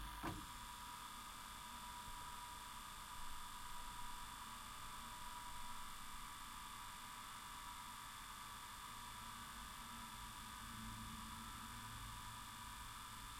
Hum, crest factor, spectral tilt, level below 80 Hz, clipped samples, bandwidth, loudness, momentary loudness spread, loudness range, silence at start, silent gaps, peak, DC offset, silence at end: 50 Hz at -75 dBFS; 18 dB; -2 dB/octave; -60 dBFS; under 0.1%; 16.5 kHz; -52 LUFS; 1 LU; 0 LU; 0 s; none; -34 dBFS; under 0.1%; 0 s